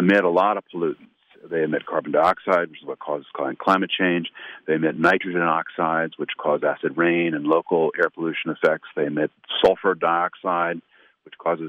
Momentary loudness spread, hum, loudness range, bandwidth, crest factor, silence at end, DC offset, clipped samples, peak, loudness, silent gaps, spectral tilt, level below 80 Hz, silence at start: 10 LU; none; 2 LU; 9.2 kHz; 16 dB; 0 s; under 0.1%; under 0.1%; -6 dBFS; -22 LUFS; none; -7 dB/octave; -66 dBFS; 0 s